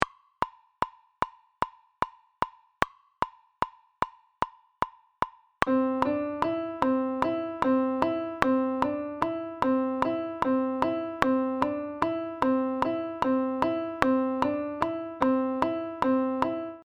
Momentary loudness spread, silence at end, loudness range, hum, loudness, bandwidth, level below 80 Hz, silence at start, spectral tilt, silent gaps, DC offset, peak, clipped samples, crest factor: 9 LU; 0.05 s; 7 LU; none; -29 LUFS; 9.4 kHz; -56 dBFS; 0 s; -6.5 dB/octave; none; under 0.1%; 0 dBFS; under 0.1%; 28 dB